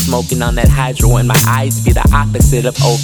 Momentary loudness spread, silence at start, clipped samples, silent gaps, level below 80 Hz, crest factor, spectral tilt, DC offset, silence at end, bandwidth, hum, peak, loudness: 3 LU; 0 s; under 0.1%; none; -16 dBFS; 10 dB; -5 dB/octave; under 0.1%; 0 s; over 20 kHz; none; 0 dBFS; -12 LUFS